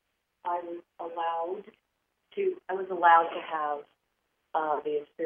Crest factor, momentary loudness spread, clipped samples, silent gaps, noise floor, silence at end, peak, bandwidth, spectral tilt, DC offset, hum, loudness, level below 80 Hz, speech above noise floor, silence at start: 22 dB; 18 LU; under 0.1%; none; -78 dBFS; 0 s; -8 dBFS; 3.6 kHz; -7 dB/octave; under 0.1%; none; -29 LUFS; -86 dBFS; 49 dB; 0.45 s